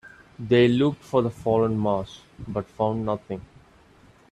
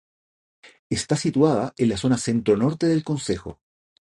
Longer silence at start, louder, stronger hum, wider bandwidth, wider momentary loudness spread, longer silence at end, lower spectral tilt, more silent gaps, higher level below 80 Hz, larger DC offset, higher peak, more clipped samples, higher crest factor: second, 0.05 s vs 0.65 s; about the same, -24 LUFS vs -22 LUFS; neither; about the same, 11 kHz vs 11.5 kHz; first, 17 LU vs 9 LU; first, 0.9 s vs 0.55 s; first, -7.5 dB/octave vs -6 dB/octave; second, none vs 0.79-0.90 s; about the same, -54 dBFS vs -50 dBFS; neither; second, -8 dBFS vs -4 dBFS; neither; about the same, 18 dB vs 18 dB